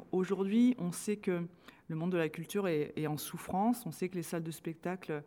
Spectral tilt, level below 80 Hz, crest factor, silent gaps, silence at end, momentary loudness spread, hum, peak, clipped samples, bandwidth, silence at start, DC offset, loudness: -6 dB/octave; -72 dBFS; 14 dB; none; 0 s; 10 LU; none; -20 dBFS; under 0.1%; 18.5 kHz; 0 s; under 0.1%; -35 LUFS